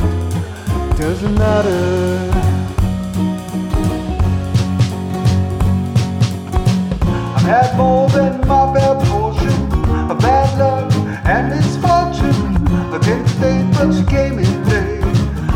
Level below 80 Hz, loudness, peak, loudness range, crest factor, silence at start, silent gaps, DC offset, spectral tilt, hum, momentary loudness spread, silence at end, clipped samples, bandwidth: -24 dBFS; -15 LUFS; -2 dBFS; 3 LU; 12 dB; 0 s; none; under 0.1%; -7 dB/octave; none; 6 LU; 0 s; under 0.1%; 15.5 kHz